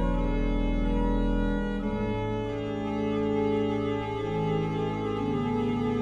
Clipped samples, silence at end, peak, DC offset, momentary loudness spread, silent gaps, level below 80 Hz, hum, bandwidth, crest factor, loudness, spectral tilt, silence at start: under 0.1%; 0 s; -14 dBFS; under 0.1%; 4 LU; none; -34 dBFS; none; 7.2 kHz; 12 dB; -29 LUFS; -8.5 dB/octave; 0 s